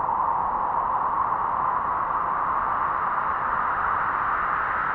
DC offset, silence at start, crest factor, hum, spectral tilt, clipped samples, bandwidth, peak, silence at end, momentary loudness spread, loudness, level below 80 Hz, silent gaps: under 0.1%; 0 s; 12 dB; none; -7.5 dB/octave; under 0.1%; 5 kHz; -12 dBFS; 0 s; 1 LU; -24 LUFS; -50 dBFS; none